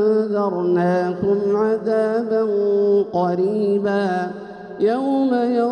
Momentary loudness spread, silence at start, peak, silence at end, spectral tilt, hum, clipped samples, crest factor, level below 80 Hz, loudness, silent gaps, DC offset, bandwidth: 4 LU; 0 s; -8 dBFS; 0 s; -8.5 dB/octave; none; under 0.1%; 10 dB; -62 dBFS; -19 LUFS; none; under 0.1%; 9.2 kHz